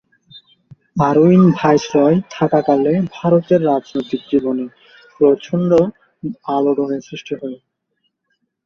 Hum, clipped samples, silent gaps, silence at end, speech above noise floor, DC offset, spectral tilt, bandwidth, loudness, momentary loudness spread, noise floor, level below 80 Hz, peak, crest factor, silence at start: none; under 0.1%; none; 1.1 s; 55 dB; under 0.1%; -8 dB/octave; 6.8 kHz; -16 LUFS; 15 LU; -70 dBFS; -56 dBFS; 0 dBFS; 16 dB; 0.35 s